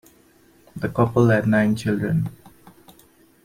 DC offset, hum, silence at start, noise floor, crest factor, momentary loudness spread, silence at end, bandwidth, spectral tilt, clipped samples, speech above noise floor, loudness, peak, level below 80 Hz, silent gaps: under 0.1%; none; 0.75 s; -55 dBFS; 18 dB; 14 LU; 1.1 s; 16 kHz; -8 dB/octave; under 0.1%; 36 dB; -21 LUFS; -6 dBFS; -54 dBFS; none